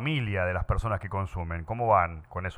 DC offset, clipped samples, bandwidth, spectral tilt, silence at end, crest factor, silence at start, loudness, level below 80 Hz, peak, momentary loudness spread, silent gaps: under 0.1%; under 0.1%; 10 kHz; -7.5 dB/octave; 0 s; 20 dB; 0 s; -29 LUFS; -40 dBFS; -8 dBFS; 10 LU; none